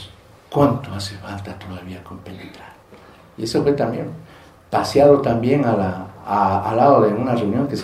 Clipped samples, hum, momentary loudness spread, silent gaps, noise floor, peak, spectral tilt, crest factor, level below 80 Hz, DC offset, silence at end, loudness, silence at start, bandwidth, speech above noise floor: under 0.1%; none; 22 LU; none; -43 dBFS; 0 dBFS; -7 dB/octave; 20 dB; -50 dBFS; under 0.1%; 0 s; -18 LUFS; 0 s; 15 kHz; 24 dB